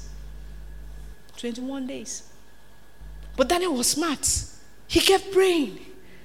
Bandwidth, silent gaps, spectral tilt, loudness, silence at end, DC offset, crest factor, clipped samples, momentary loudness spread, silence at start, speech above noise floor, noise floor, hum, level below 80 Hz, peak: 16.5 kHz; none; -2.5 dB/octave; -24 LUFS; 0.25 s; 0.7%; 24 dB; under 0.1%; 25 LU; 0 s; 30 dB; -53 dBFS; none; -44 dBFS; -2 dBFS